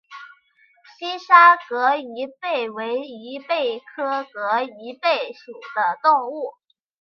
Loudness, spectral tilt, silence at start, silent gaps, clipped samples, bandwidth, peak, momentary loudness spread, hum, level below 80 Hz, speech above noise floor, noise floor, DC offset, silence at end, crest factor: -20 LUFS; -3.5 dB/octave; 0.1 s; none; under 0.1%; 6.6 kHz; 0 dBFS; 19 LU; none; -82 dBFS; 38 dB; -59 dBFS; under 0.1%; 0.5 s; 20 dB